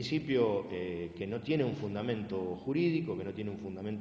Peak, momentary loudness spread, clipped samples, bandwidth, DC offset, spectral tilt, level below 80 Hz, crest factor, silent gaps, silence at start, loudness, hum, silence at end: -16 dBFS; 9 LU; under 0.1%; 8 kHz; under 0.1%; -7.5 dB/octave; -62 dBFS; 18 dB; none; 0 s; -34 LUFS; none; 0 s